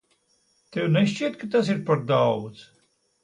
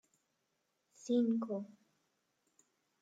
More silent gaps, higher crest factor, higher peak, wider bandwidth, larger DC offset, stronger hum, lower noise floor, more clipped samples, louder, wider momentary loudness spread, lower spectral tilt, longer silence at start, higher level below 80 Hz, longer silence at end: neither; about the same, 16 dB vs 18 dB; first, -8 dBFS vs -22 dBFS; first, 10.5 kHz vs 7.8 kHz; neither; neither; second, -67 dBFS vs -83 dBFS; neither; first, -24 LUFS vs -36 LUFS; second, 9 LU vs 20 LU; about the same, -7 dB/octave vs -6.5 dB/octave; second, 0.7 s vs 1.05 s; first, -66 dBFS vs under -90 dBFS; second, 0.6 s vs 1.3 s